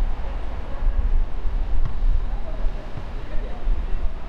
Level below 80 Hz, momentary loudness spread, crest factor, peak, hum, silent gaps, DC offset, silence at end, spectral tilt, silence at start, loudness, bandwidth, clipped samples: -22 dBFS; 7 LU; 12 dB; -8 dBFS; none; none; under 0.1%; 0 s; -7.5 dB/octave; 0 s; -30 LUFS; 4.4 kHz; under 0.1%